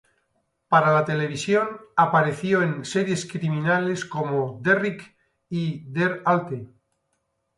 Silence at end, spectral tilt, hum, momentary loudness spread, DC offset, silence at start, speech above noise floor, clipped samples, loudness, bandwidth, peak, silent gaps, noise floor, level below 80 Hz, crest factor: 0.9 s; -6 dB/octave; none; 9 LU; under 0.1%; 0.7 s; 51 dB; under 0.1%; -23 LUFS; 11.5 kHz; -4 dBFS; none; -74 dBFS; -66 dBFS; 20 dB